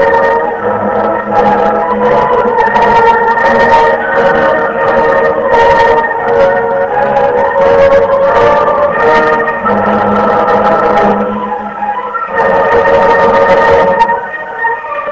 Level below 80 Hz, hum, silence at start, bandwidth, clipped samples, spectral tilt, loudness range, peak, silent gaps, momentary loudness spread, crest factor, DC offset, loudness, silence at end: -36 dBFS; none; 0 s; 8 kHz; 0.7%; -6 dB/octave; 2 LU; 0 dBFS; none; 7 LU; 8 dB; 0.5%; -9 LUFS; 0 s